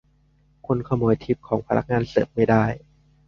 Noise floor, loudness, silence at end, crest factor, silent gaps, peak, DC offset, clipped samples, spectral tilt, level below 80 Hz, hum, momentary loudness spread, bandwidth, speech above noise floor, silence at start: -60 dBFS; -23 LUFS; 0.5 s; 20 dB; none; -4 dBFS; under 0.1%; under 0.1%; -9 dB/octave; -48 dBFS; none; 7 LU; 6.8 kHz; 39 dB; 0.7 s